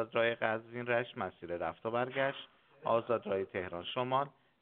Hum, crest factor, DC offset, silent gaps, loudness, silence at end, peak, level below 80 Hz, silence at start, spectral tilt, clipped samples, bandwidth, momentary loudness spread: none; 22 dB; under 0.1%; none; -36 LUFS; 0.3 s; -14 dBFS; -74 dBFS; 0 s; -3 dB/octave; under 0.1%; 4.3 kHz; 9 LU